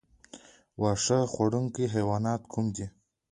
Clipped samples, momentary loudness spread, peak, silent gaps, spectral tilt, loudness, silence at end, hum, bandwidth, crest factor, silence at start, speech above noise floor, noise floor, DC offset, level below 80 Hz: under 0.1%; 11 LU; -12 dBFS; none; -5.5 dB/octave; -29 LUFS; 0.4 s; none; 11 kHz; 18 dB; 0.35 s; 25 dB; -53 dBFS; under 0.1%; -56 dBFS